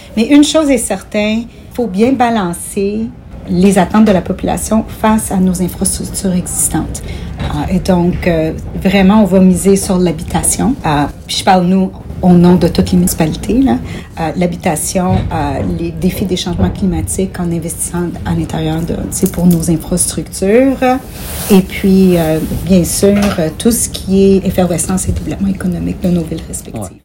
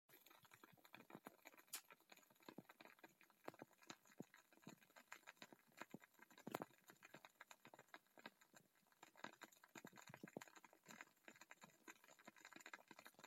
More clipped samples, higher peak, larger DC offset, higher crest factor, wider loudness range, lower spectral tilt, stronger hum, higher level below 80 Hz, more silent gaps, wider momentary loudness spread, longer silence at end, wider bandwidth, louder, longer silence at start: first, 0.5% vs under 0.1%; first, 0 dBFS vs -28 dBFS; neither; second, 12 dB vs 36 dB; about the same, 4 LU vs 3 LU; first, -5.5 dB/octave vs -3 dB/octave; neither; first, -28 dBFS vs under -90 dBFS; neither; about the same, 9 LU vs 11 LU; about the same, 0.05 s vs 0 s; about the same, 17 kHz vs 16 kHz; first, -12 LUFS vs -63 LUFS; about the same, 0 s vs 0.1 s